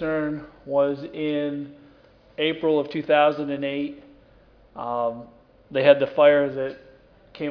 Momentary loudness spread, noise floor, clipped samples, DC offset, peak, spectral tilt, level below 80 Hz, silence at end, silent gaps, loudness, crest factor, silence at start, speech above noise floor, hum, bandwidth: 17 LU; -54 dBFS; under 0.1%; under 0.1%; -2 dBFS; -8 dB/octave; -60 dBFS; 0 s; none; -23 LUFS; 22 dB; 0 s; 32 dB; none; 5.4 kHz